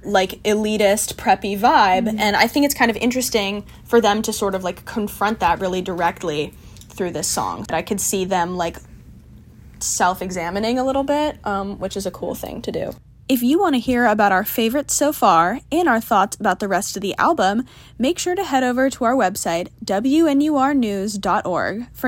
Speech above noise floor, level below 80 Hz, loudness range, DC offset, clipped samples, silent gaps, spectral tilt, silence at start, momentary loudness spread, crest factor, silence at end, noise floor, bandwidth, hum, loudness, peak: 24 dB; -46 dBFS; 5 LU; under 0.1%; under 0.1%; none; -3.5 dB/octave; 0.05 s; 10 LU; 20 dB; 0 s; -43 dBFS; 16.5 kHz; none; -19 LUFS; 0 dBFS